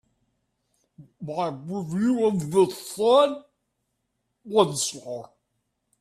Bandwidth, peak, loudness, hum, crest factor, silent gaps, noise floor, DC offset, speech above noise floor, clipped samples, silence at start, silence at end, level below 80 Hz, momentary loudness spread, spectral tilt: 14.5 kHz; -4 dBFS; -24 LUFS; none; 22 dB; none; -77 dBFS; under 0.1%; 54 dB; under 0.1%; 1 s; 0.75 s; -68 dBFS; 17 LU; -5 dB/octave